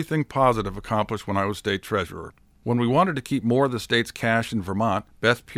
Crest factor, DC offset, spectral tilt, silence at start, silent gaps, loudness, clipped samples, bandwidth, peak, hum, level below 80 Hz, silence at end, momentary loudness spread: 18 dB; under 0.1%; -6 dB/octave; 0 s; none; -24 LUFS; under 0.1%; 15.5 kHz; -6 dBFS; none; -50 dBFS; 0 s; 7 LU